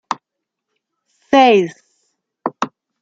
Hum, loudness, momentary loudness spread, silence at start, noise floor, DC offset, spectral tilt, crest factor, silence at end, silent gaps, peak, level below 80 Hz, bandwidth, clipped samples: none; -15 LUFS; 17 LU; 0.1 s; -80 dBFS; under 0.1%; -5 dB/octave; 18 dB; 0.35 s; none; 0 dBFS; -64 dBFS; 7.8 kHz; under 0.1%